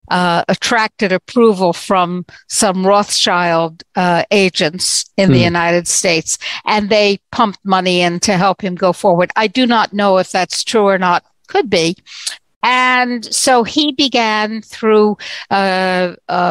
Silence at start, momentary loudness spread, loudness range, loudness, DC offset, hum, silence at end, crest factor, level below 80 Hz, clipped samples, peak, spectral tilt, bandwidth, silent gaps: 0.1 s; 7 LU; 1 LU; -13 LUFS; under 0.1%; none; 0 s; 14 dB; -52 dBFS; under 0.1%; 0 dBFS; -3.5 dB/octave; 16 kHz; 12.56-12.61 s